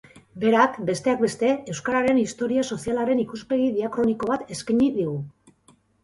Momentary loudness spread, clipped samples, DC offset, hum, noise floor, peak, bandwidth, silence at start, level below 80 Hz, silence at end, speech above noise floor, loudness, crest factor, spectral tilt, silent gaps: 7 LU; under 0.1%; under 0.1%; none; -59 dBFS; -4 dBFS; 11.5 kHz; 0.15 s; -58 dBFS; 0.75 s; 37 dB; -23 LUFS; 20 dB; -5.5 dB/octave; none